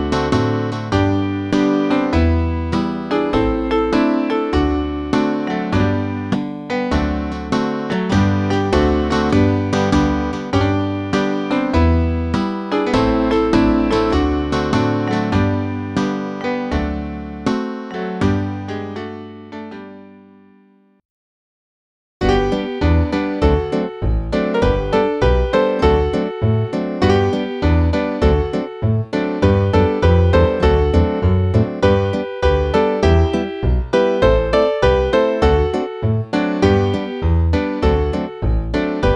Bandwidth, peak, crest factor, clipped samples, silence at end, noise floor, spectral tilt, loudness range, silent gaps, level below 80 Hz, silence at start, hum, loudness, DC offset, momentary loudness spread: 9.2 kHz; -2 dBFS; 16 dB; under 0.1%; 0 s; -52 dBFS; -7.5 dB/octave; 7 LU; 21.05-22.20 s; -26 dBFS; 0 s; none; -17 LUFS; under 0.1%; 7 LU